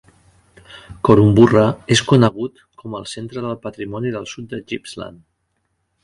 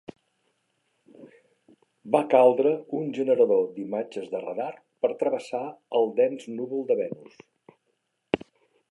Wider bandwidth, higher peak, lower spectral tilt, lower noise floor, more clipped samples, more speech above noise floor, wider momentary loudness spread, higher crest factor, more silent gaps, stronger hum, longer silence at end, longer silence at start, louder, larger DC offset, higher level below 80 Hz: about the same, 11.5 kHz vs 11 kHz; first, 0 dBFS vs -6 dBFS; about the same, -6 dB/octave vs -6.5 dB/octave; second, -70 dBFS vs -76 dBFS; neither; about the same, 53 dB vs 51 dB; first, 20 LU vs 14 LU; about the same, 18 dB vs 22 dB; neither; neither; first, 0.95 s vs 0.55 s; second, 0.7 s vs 1.2 s; first, -16 LUFS vs -26 LUFS; neither; first, -46 dBFS vs -70 dBFS